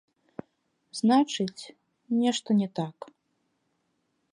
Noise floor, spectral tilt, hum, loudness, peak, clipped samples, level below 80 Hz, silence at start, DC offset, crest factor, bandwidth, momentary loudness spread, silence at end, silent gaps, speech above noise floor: -76 dBFS; -5 dB/octave; none; -27 LUFS; -10 dBFS; under 0.1%; -80 dBFS; 0.95 s; under 0.1%; 18 dB; 11 kHz; 23 LU; 1.45 s; none; 49 dB